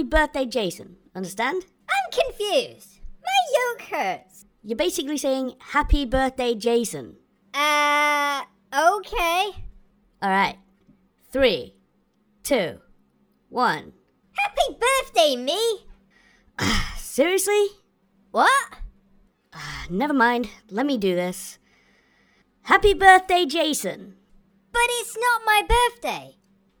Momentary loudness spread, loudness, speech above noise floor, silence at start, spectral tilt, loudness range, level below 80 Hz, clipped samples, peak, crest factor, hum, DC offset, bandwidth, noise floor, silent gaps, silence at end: 15 LU; -22 LUFS; 43 dB; 0 s; -3 dB/octave; 6 LU; -38 dBFS; under 0.1%; 0 dBFS; 22 dB; none; under 0.1%; over 20 kHz; -65 dBFS; none; 0.5 s